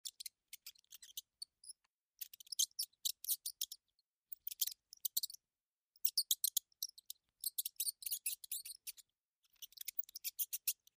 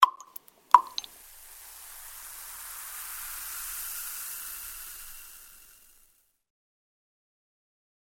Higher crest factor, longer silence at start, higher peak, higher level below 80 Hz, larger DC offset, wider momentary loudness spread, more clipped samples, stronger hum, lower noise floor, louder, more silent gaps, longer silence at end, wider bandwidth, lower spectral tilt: second, 26 dB vs 32 dB; about the same, 0.05 s vs 0 s; second, -20 dBFS vs 0 dBFS; second, under -90 dBFS vs -62 dBFS; neither; second, 19 LU vs 24 LU; neither; neither; first, under -90 dBFS vs -66 dBFS; second, -41 LUFS vs -31 LUFS; first, 1.86-2.09 s, 3.95-4.22 s, 5.65-5.91 s, 9.18-9.42 s vs none; second, 0.25 s vs 2.4 s; about the same, 16 kHz vs 17 kHz; second, 6.5 dB/octave vs 2 dB/octave